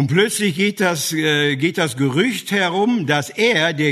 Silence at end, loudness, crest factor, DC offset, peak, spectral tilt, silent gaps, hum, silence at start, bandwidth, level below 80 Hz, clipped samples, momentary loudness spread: 0 s; -17 LUFS; 16 dB; under 0.1%; -2 dBFS; -4.5 dB/octave; none; none; 0 s; 13.5 kHz; -62 dBFS; under 0.1%; 3 LU